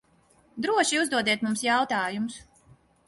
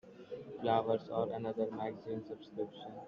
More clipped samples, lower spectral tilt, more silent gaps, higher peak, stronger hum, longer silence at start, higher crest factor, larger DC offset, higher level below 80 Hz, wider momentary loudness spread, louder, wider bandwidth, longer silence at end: neither; second, -2.5 dB/octave vs -5.5 dB/octave; neither; first, -8 dBFS vs -18 dBFS; neither; first, 0.55 s vs 0.05 s; about the same, 18 dB vs 20 dB; neither; first, -66 dBFS vs -76 dBFS; second, 11 LU vs 14 LU; first, -25 LUFS vs -38 LUFS; first, 12 kHz vs 6.8 kHz; first, 0.65 s vs 0 s